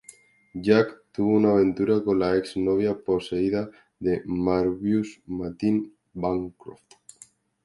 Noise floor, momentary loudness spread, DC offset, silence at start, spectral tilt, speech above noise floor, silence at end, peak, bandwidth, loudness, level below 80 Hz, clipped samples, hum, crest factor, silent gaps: -55 dBFS; 12 LU; under 0.1%; 0.55 s; -7.5 dB/octave; 31 dB; 0.9 s; -6 dBFS; 11.5 kHz; -25 LUFS; -54 dBFS; under 0.1%; none; 20 dB; none